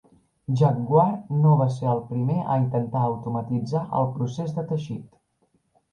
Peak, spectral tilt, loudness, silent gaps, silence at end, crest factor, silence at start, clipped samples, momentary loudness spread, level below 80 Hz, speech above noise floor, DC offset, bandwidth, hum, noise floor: -6 dBFS; -9.5 dB/octave; -24 LUFS; none; 0.85 s; 18 dB; 0.5 s; under 0.1%; 10 LU; -60 dBFS; 45 dB; under 0.1%; 7 kHz; none; -68 dBFS